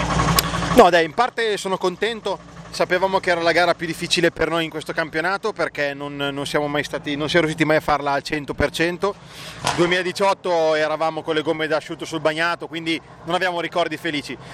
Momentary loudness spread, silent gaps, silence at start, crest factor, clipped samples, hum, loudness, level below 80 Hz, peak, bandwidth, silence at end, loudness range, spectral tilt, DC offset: 8 LU; none; 0 s; 20 dB; under 0.1%; none; -21 LUFS; -42 dBFS; 0 dBFS; 15.5 kHz; 0 s; 4 LU; -4 dB/octave; under 0.1%